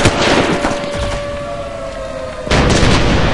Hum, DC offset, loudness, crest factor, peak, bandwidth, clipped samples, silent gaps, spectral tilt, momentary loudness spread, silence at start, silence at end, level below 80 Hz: none; under 0.1%; -15 LUFS; 14 dB; 0 dBFS; 11.5 kHz; under 0.1%; none; -4.5 dB/octave; 13 LU; 0 s; 0 s; -24 dBFS